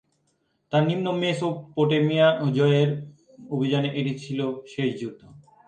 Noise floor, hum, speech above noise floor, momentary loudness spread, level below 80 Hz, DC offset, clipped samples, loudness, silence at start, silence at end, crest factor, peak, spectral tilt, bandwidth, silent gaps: -71 dBFS; none; 48 dB; 11 LU; -68 dBFS; under 0.1%; under 0.1%; -24 LUFS; 0.7 s; 0.3 s; 18 dB; -6 dBFS; -7 dB/octave; 9.2 kHz; none